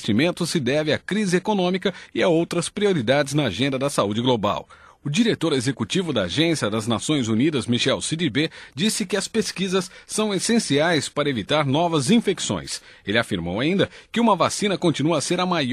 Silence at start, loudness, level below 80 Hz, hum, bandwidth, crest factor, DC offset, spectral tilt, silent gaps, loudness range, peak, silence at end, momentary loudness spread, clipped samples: 0 s; -22 LUFS; -56 dBFS; none; 13 kHz; 18 dB; under 0.1%; -4.5 dB/octave; none; 1 LU; -4 dBFS; 0 s; 5 LU; under 0.1%